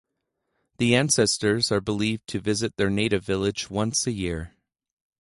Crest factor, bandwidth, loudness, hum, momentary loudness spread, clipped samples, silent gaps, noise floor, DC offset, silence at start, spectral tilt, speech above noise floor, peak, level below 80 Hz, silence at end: 20 dB; 11.5 kHz; -24 LUFS; none; 9 LU; under 0.1%; none; -79 dBFS; under 0.1%; 0.8 s; -4 dB/octave; 55 dB; -6 dBFS; -48 dBFS; 0.75 s